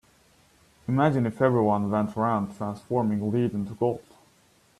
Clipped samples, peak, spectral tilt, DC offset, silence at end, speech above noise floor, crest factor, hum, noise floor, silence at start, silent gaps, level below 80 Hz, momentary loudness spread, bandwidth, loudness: under 0.1%; -8 dBFS; -9 dB/octave; under 0.1%; 0.8 s; 37 dB; 18 dB; none; -61 dBFS; 0.9 s; none; -62 dBFS; 8 LU; 12.5 kHz; -26 LUFS